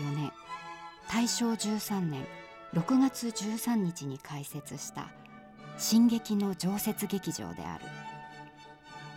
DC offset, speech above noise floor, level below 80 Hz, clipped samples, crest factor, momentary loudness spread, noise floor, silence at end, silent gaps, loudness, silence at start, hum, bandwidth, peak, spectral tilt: under 0.1%; 21 dB; -66 dBFS; under 0.1%; 18 dB; 20 LU; -51 dBFS; 0 s; none; -32 LUFS; 0 s; none; 17 kHz; -16 dBFS; -4.5 dB/octave